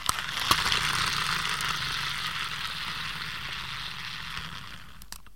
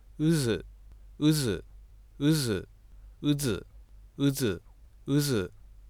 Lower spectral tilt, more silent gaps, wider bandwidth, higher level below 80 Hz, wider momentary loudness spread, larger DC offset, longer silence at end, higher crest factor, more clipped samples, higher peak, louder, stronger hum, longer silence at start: second, -1 dB/octave vs -5.5 dB/octave; neither; second, 16.5 kHz vs over 20 kHz; about the same, -50 dBFS vs -50 dBFS; first, 15 LU vs 11 LU; first, 0.6% vs under 0.1%; second, 0.05 s vs 0.35 s; first, 26 dB vs 16 dB; neither; first, -4 dBFS vs -14 dBFS; about the same, -29 LUFS vs -29 LUFS; neither; second, 0 s vs 0.2 s